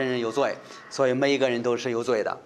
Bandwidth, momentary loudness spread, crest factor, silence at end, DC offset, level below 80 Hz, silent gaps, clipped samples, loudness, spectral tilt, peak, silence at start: 11.5 kHz; 6 LU; 18 dB; 0.05 s; under 0.1%; -74 dBFS; none; under 0.1%; -25 LUFS; -4.5 dB/octave; -8 dBFS; 0 s